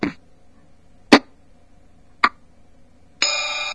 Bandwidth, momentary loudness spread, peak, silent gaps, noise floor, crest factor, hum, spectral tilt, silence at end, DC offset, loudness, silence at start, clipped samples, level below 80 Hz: 11 kHz; 6 LU; 0 dBFS; none; -53 dBFS; 24 dB; 60 Hz at -65 dBFS; -2.5 dB/octave; 0 s; 0.4%; -19 LUFS; 0 s; under 0.1%; -56 dBFS